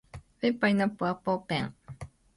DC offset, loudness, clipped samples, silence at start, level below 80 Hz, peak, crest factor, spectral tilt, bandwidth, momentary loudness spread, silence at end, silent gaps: under 0.1%; -29 LUFS; under 0.1%; 0.15 s; -58 dBFS; -14 dBFS; 18 dB; -7 dB/octave; 11.5 kHz; 20 LU; 0.3 s; none